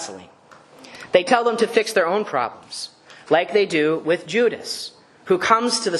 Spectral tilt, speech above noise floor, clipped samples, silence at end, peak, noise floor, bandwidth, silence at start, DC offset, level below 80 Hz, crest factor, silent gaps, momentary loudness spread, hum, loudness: -3.5 dB/octave; 27 dB; under 0.1%; 0 s; 0 dBFS; -47 dBFS; 13 kHz; 0 s; under 0.1%; -68 dBFS; 22 dB; none; 15 LU; none; -20 LUFS